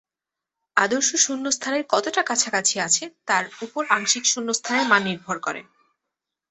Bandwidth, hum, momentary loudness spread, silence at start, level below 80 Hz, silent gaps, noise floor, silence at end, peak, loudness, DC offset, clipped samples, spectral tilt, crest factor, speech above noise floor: 8.6 kHz; none; 9 LU; 0.75 s; -72 dBFS; none; -88 dBFS; 0.9 s; -2 dBFS; -21 LUFS; under 0.1%; under 0.1%; -1 dB/octave; 22 dB; 65 dB